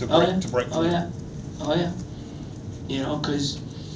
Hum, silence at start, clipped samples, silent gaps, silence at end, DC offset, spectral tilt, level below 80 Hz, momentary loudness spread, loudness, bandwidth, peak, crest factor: none; 0 s; under 0.1%; none; 0 s; under 0.1%; -5.5 dB/octave; -46 dBFS; 15 LU; -26 LUFS; 8 kHz; -4 dBFS; 22 dB